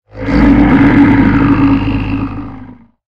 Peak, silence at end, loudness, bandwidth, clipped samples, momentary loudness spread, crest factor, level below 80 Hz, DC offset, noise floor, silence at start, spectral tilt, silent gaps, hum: 0 dBFS; 0.4 s; -9 LUFS; 5.6 kHz; 0.2%; 13 LU; 10 dB; -22 dBFS; 2%; -34 dBFS; 0.1 s; -9 dB/octave; none; none